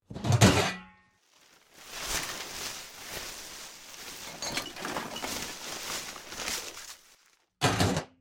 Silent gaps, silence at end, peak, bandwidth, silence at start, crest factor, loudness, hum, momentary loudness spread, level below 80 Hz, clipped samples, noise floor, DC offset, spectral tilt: none; 0.15 s; -6 dBFS; 17.5 kHz; 0.1 s; 26 dB; -31 LUFS; none; 19 LU; -52 dBFS; under 0.1%; -64 dBFS; under 0.1%; -4 dB/octave